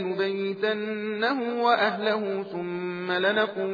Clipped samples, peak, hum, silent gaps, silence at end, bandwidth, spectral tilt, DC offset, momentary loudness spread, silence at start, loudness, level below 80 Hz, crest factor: under 0.1%; -8 dBFS; none; none; 0 s; 5 kHz; -7 dB/octave; under 0.1%; 8 LU; 0 s; -26 LUFS; -86 dBFS; 18 dB